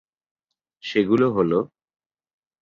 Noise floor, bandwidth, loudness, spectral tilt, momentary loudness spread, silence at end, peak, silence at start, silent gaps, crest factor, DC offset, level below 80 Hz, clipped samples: -48 dBFS; 7.4 kHz; -21 LUFS; -7.5 dB/octave; 15 LU; 0.95 s; -6 dBFS; 0.85 s; none; 18 dB; under 0.1%; -62 dBFS; under 0.1%